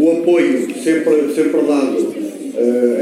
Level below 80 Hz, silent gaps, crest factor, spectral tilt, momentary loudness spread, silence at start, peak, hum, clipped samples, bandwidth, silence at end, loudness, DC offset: -72 dBFS; none; 12 dB; -5.5 dB/octave; 7 LU; 0 s; -2 dBFS; none; under 0.1%; 15 kHz; 0 s; -15 LUFS; under 0.1%